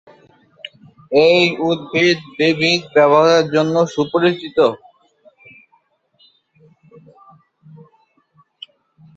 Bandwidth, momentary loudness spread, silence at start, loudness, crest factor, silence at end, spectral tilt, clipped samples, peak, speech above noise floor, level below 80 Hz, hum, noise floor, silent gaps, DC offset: 7.8 kHz; 19 LU; 1.1 s; -15 LUFS; 18 dB; 4.4 s; -5 dB/octave; under 0.1%; -2 dBFS; 46 dB; -62 dBFS; none; -60 dBFS; none; under 0.1%